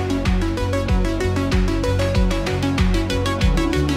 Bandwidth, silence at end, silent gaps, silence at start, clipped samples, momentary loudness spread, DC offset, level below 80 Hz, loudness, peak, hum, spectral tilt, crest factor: 15 kHz; 0 s; none; 0 s; under 0.1%; 2 LU; under 0.1%; -22 dBFS; -20 LUFS; -6 dBFS; none; -6 dB/octave; 14 dB